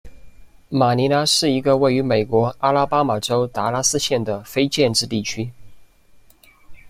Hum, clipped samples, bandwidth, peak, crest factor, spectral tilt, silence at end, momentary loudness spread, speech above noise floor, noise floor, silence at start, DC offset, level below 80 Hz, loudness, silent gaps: none; under 0.1%; 16 kHz; -4 dBFS; 16 dB; -4 dB/octave; 0 s; 8 LU; 32 dB; -51 dBFS; 0.05 s; under 0.1%; -50 dBFS; -19 LUFS; none